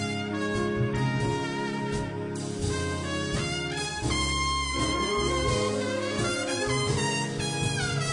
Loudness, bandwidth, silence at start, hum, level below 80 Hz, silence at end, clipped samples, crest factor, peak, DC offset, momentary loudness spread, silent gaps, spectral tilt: -28 LUFS; 10.5 kHz; 0 s; none; -42 dBFS; 0 s; under 0.1%; 14 dB; -14 dBFS; under 0.1%; 4 LU; none; -4 dB/octave